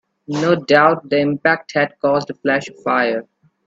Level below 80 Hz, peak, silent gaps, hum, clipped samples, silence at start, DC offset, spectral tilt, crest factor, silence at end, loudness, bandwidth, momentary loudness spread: -60 dBFS; 0 dBFS; none; none; under 0.1%; 0.3 s; under 0.1%; -6 dB/octave; 18 dB; 0.45 s; -17 LUFS; 7.8 kHz; 8 LU